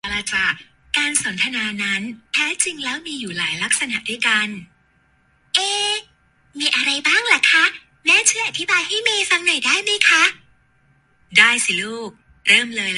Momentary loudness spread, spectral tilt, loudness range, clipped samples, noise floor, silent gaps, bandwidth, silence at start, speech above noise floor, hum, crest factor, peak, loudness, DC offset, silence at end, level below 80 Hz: 11 LU; 0 dB/octave; 5 LU; under 0.1%; -59 dBFS; none; 11.5 kHz; 0.05 s; 41 dB; none; 20 dB; 0 dBFS; -17 LUFS; under 0.1%; 0 s; -58 dBFS